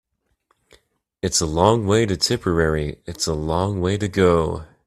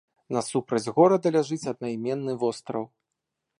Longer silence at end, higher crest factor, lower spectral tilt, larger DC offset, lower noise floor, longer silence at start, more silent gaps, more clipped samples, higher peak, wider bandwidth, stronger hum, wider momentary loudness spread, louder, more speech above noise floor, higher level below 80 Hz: second, 0.2 s vs 0.75 s; about the same, 20 dB vs 20 dB; second, -4.5 dB/octave vs -6 dB/octave; neither; second, -68 dBFS vs -83 dBFS; first, 1.25 s vs 0.3 s; neither; neither; first, 0 dBFS vs -6 dBFS; first, 14.5 kHz vs 11.5 kHz; neither; second, 8 LU vs 13 LU; first, -20 LUFS vs -26 LUFS; second, 48 dB vs 58 dB; first, -40 dBFS vs -72 dBFS